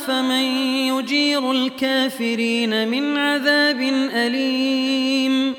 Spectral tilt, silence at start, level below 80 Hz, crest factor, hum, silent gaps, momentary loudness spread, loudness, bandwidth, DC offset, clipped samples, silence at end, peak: -3 dB/octave; 0 s; -70 dBFS; 16 dB; none; none; 3 LU; -19 LUFS; 17.5 kHz; under 0.1%; under 0.1%; 0 s; -4 dBFS